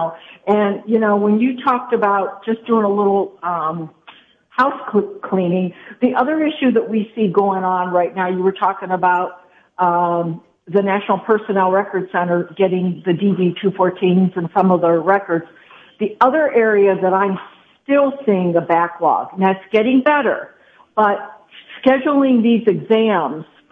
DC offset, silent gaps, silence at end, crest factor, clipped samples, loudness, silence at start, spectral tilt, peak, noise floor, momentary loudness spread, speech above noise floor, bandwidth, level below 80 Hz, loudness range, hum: under 0.1%; none; 0.3 s; 16 dB; under 0.1%; -17 LUFS; 0 s; -9.5 dB/octave; -2 dBFS; -46 dBFS; 9 LU; 30 dB; 4.8 kHz; -66 dBFS; 3 LU; none